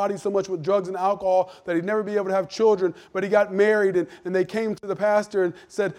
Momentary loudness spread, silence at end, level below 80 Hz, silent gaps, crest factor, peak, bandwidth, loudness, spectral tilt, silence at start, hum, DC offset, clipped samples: 7 LU; 0.05 s; -68 dBFS; none; 16 dB; -6 dBFS; 11.5 kHz; -23 LUFS; -6 dB/octave; 0 s; none; under 0.1%; under 0.1%